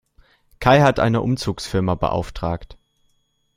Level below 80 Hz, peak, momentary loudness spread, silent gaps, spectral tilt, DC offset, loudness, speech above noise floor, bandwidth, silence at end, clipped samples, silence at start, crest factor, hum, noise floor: -40 dBFS; -2 dBFS; 12 LU; none; -6.5 dB/octave; under 0.1%; -19 LUFS; 47 dB; 15.5 kHz; 0.85 s; under 0.1%; 0.6 s; 20 dB; none; -66 dBFS